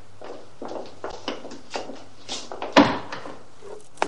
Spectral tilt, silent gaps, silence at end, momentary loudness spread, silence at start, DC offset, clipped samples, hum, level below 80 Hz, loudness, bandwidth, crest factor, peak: -4 dB/octave; none; 0 s; 24 LU; 0.2 s; 2%; under 0.1%; none; -58 dBFS; -26 LUFS; 11 kHz; 28 dB; 0 dBFS